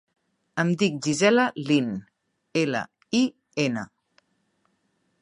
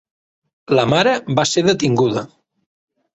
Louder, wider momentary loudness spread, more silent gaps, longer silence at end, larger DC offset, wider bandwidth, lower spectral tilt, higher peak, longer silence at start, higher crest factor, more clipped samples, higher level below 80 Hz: second, -25 LUFS vs -16 LUFS; first, 13 LU vs 4 LU; neither; first, 1.35 s vs 0.9 s; neither; first, 11 kHz vs 8.2 kHz; about the same, -5 dB/octave vs -4.5 dB/octave; second, -6 dBFS vs -2 dBFS; second, 0.55 s vs 0.7 s; about the same, 20 dB vs 18 dB; neither; second, -70 dBFS vs -54 dBFS